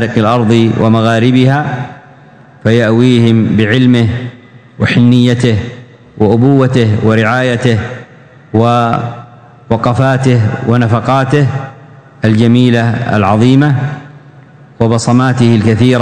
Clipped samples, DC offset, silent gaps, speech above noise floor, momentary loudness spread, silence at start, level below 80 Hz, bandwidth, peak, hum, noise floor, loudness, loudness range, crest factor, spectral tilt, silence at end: 2%; under 0.1%; none; 29 dB; 10 LU; 0 s; -42 dBFS; 9.4 kHz; 0 dBFS; none; -38 dBFS; -10 LUFS; 2 LU; 10 dB; -7 dB/octave; 0 s